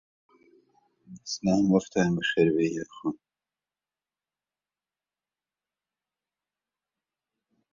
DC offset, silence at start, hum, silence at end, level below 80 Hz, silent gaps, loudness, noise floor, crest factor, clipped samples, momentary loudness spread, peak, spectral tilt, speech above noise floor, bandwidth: under 0.1%; 1.1 s; 50 Hz at -60 dBFS; 4.6 s; -64 dBFS; none; -26 LUFS; under -90 dBFS; 22 dB; under 0.1%; 12 LU; -8 dBFS; -5.5 dB/octave; over 64 dB; 7.6 kHz